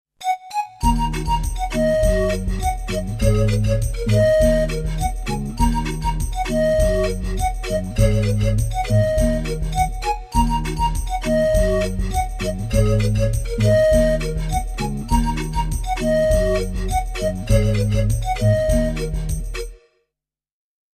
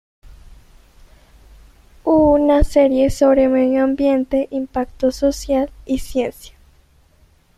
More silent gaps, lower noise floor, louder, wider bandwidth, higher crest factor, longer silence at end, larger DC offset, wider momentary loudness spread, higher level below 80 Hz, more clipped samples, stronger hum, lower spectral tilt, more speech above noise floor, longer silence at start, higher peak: neither; first, -86 dBFS vs -54 dBFS; second, -20 LUFS vs -17 LUFS; about the same, 14 kHz vs 14 kHz; about the same, 16 dB vs 16 dB; about the same, 1.2 s vs 1.1 s; neither; second, 7 LU vs 10 LU; first, -24 dBFS vs -34 dBFS; neither; neither; about the same, -6 dB/octave vs -6.5 dB/octave; first, 69 dB vs 37 dB; about the same, 0.2 s vs 0.3 s; about the same, -4 dBFS vs -2 dBFS